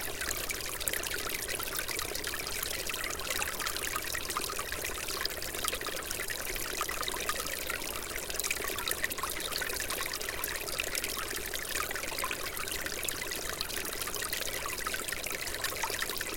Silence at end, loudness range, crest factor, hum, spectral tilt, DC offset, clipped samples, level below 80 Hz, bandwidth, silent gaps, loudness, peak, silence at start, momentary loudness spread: 0 s; 1 LU; 26 dB; none; -1 dB/octave; under 0.1%; under 0.1%; -50 dBFS; 17 kHz; none; -33 LUFS; -8 dBFS; 0 s; 2 LU